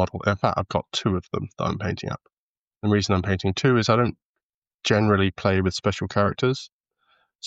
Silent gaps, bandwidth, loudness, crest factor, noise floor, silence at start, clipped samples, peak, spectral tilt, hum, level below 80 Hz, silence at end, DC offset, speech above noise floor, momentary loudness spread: 2.33-2.71 s, 2.77-2.81 s, 4.25-4.34 s, 4.43-4.62 s, 4.74-4.79 s, 6.72-6.84 s; 8 kHz; -24 LUFS; 20 dB; under -90 dBFS; 0 s; under 0.1%; -4 dBFS; -6 dB/octave; none; -50 dBFS; 0 s; under 0.1%; over 67 dB; 10 LU